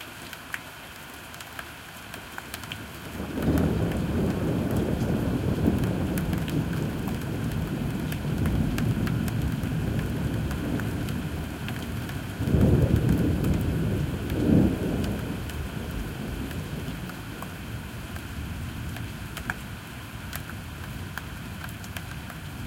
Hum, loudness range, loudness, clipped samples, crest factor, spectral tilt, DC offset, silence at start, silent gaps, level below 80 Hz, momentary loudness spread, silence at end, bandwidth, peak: none; 11 LU; -29 LUFS; under 0.1%; 20 dB; -6.5 dB/octave; under 0.1%; 0 s; none; -38 dBFS; 13 LU; 0 s; 17 kHz; -8 dBFS